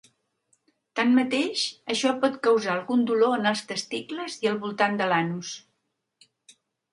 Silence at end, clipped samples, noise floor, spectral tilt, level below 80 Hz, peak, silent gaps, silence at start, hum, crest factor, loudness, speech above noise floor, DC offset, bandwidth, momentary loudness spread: 1.35 s; under 0.1%; -78 dBFS; -4 dB/octave; -76 dBFS; -6 dBFS; none; 0.95 s; none; 20 dB; -25 LUFS; 53 dB; under 0.1%; 11.5 kHz; 11 LU